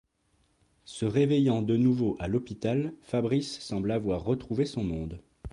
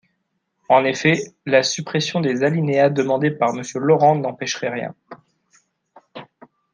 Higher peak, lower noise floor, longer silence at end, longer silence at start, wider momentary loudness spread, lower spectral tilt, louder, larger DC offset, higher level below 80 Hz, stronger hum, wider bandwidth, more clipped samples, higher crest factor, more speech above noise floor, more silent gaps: second, -14 dBFS vs -2 dBFS; about the same, -70 dBFS vs -73 dBFS; second, 0.05 s vs 0.5 s; first, 0.85 s vs 0.7 s; second, 9 LU vs 12 LU; first, -7.5 dB/octave vs -5 dB/octave; second, -29 LUFS vs -19 LUFS; neither; first, -50 dBFS vs -66 dBFS; neither; about the same, 11 kHz vs 10 kHz; neither; about the same, 16 dB vs 18 dB; second, 42 dB vs 54 dB; neither